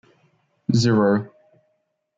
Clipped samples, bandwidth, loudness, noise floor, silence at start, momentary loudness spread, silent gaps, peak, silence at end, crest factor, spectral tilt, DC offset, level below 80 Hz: under 0.1%; 7.8 kHz; -20 LUFS; -72 dBFS; 0.7 s; 15 LU; none; -6 dBFS; 0.9 s; 16 dB; -6.5 dB/octave; under 0.1%; -62 dBFS